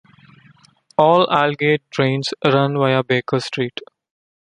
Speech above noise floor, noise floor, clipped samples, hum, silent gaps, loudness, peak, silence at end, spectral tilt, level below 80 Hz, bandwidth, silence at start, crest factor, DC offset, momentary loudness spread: 36 dB; -53 dBFS; under 0.1%; none; none; -18 LUFS; -2 dBFS; 0.7 s; -6 dB/octave; -62 dBFS; 10.5 kHz; 1 s; 18 dB; under 0.1%; 10 LU